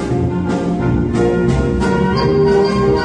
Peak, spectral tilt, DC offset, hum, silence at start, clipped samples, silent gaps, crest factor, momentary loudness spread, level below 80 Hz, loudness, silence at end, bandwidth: -2 dBFS; -7.5 dB/octave; under 0.1%; none; 0 s; under 0.1%; none; 12 dB; 5 LU; -28 dBFS; -15 LUFS; 0 s; 10 kHz